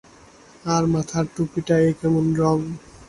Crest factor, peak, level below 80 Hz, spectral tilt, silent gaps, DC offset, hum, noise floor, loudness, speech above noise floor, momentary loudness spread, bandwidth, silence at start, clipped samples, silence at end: 16 dB; -6 dBFS; -50 dBFS; -7 dB/octave; none; under 0.1%; none; -49 dBFS; -21 LUFS; 28 dB; 7 LU; 11.5 kHz; 0.65 s; under 0.1%; 0.05 s